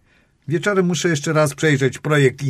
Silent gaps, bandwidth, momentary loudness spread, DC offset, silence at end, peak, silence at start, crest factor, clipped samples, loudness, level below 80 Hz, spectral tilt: none; 14.5 kHz; 5 LU; under 0.1%; 0 s; -2 dBFS; 0.5 s; 16 dB; under 0.1%; -18 LUFS; -56 dBFS; -5.5 dB/octave